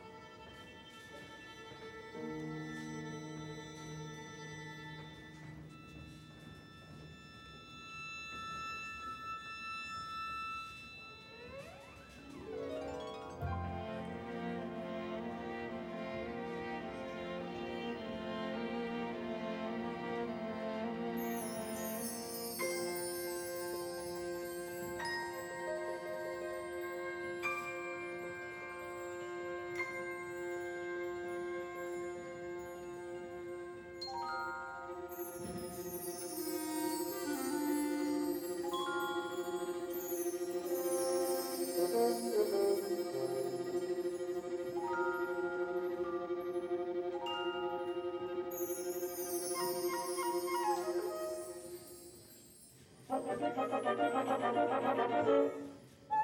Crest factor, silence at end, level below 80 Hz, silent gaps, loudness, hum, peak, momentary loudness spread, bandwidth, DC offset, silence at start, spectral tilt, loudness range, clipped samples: 20 dB; 0 s; -68 dBFS; none; -39 LUFS; none; -20 dBFS; 16 LU; 19 kHz; under 0.1%; 0 s; -4 dB/octave; 10 LU; under 0.1%